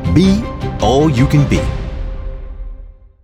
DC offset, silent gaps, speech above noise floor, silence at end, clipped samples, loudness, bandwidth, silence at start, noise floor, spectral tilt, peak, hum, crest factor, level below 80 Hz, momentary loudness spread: under 0.1%; none; 23 dB; 0.3 s; under 0.1%; -14 LUFS; 14.5 kHz; 0 s; -35 dBFS; -7 dB/octave; 0 dBFS; none; 14 dB; -24 dBFS; 20 LU